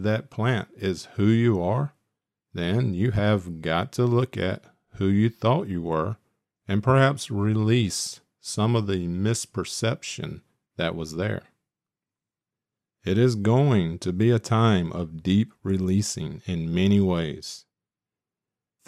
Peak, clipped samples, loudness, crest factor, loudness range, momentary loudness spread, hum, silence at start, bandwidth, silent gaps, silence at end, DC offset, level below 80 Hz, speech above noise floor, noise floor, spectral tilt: -6 dBFS; under 0.1%; -25 LUFS; 20 dB; 6 LU; 12 LU; none; 0 s; 13.5 kHz; none; 1.3 s; under 0.1%; -54 dBFS; 66 dB; -90 dBFS; -6 dB/octave